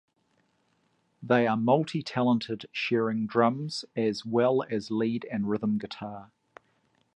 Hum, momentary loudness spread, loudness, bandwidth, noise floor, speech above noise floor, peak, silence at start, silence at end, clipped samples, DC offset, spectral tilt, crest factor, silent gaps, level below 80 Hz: none; 10 LU; -28 LUFS; 10 kHz; -71 dBFS; 44 dB; -10 dBFS; 1.2 s; 0.9 s; under 0.1%; under 0.1%; -6.5 dB/octave; 20 dB; none; -70 dBFS